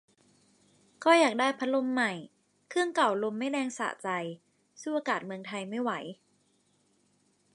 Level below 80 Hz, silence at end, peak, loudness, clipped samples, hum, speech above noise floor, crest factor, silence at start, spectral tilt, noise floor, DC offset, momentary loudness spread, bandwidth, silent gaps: -86 dBFS; 1.4 s; -10 dBFS; -30 LUFS; under 0.1%; 50 Hz at -65 dBFS; 41 dB; 22 dB; 1 s; -4 dB/octave; -70 dBFS; under 0.1%; 15 LU; 11.5 kHz; none